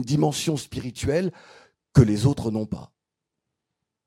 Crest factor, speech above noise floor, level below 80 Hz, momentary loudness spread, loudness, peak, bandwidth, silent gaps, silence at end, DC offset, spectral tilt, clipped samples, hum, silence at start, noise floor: 22 dB; 62 dB; -48 dBFS; 13 LU; -24 LUFS; -2 dBFS; 14.5 kHz; none; 1.2 s; under 0.1%; -6.5 dB/octave; under 0.1%; none; 0 s; -84 dBFS